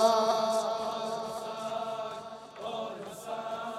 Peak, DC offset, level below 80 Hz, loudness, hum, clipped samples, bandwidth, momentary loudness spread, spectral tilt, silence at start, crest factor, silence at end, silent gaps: -12 dBFS; under 0.1%; -74 dBFS; -33 LUFS; none; under 0.1%; 15 kHz; 14 LU; -3 dB/octave; 0 s; 20 dB; 0 s; none